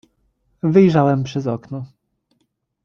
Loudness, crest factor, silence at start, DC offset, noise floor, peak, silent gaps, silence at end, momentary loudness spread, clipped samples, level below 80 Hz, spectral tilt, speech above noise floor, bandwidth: -17 LUFS; 18 dB; 0.65 s; under 0.1%; -69 dBFS; -2 dBFS; none; 1 s; 19 LU; under 0.1%; -56 dBFS; -8.5 dB/octave; 53 dB; 7 kHz